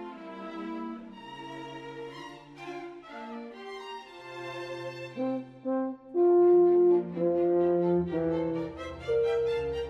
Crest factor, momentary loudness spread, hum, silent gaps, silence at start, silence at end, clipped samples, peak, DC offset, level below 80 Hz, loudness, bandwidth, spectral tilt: 14 dB; 21 LU; none; none; 0 s; 0 s; under 0.1%; -16 dBFS; under 0.1%; -58 dBFS; -28 LUFS; 6.6 kHz; -8 dB/octave